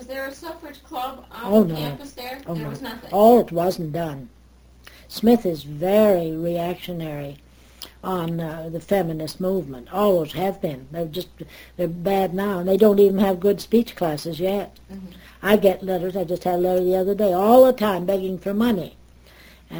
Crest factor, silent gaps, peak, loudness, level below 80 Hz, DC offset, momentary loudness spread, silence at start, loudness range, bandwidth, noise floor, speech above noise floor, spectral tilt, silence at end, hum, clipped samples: 20 dB; none; -2 dBFS; -21 LUFS; -50 dBFS; under 0.1%; 18 LU; 0 s; 6 LU; over 20 kHz; -50 dBFS; 29 dB; -7 dB/octave; 0 s; none; under 0.1%